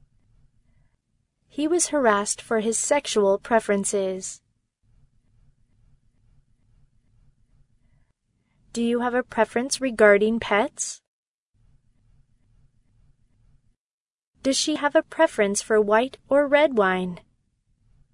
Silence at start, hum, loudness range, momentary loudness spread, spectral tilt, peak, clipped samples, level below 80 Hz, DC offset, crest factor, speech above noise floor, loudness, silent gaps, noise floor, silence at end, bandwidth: 1.55 s; none; 11 LU; 12 LU; -3 dB/octave; -2 dBFS; under 0.1%; -60 dBFS; under 0.1%; 22 dB; over 68 dB; -22 LUFS; 11.07-11.52 s, 13.78-14.20 s, 14.26-14.33 s; under -90 dBFS; 0.95 s; 11 kHz